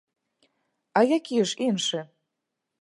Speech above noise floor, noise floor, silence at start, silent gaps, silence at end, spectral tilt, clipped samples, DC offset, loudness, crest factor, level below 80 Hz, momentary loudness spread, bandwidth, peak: 59 dB; -83 dBFS; 0.95 s; none; 0.8 s; -4 dB/octave; under 0.1%; under 0.1%; -25 LUFS; 22 dB; -78 dBFS; 6 LU; 11.5 kHz; -6 dBFS